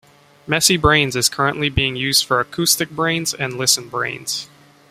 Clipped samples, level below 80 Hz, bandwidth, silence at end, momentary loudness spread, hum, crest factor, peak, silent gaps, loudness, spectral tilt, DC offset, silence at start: under 0.1%; -40 dBFS; 16 kHz; 0.45 s; 9 LU; none; 18 dB; -2 dBFS; none; -17 LUFS; -2.5 dB/octave; under 0.1%; 0.45 s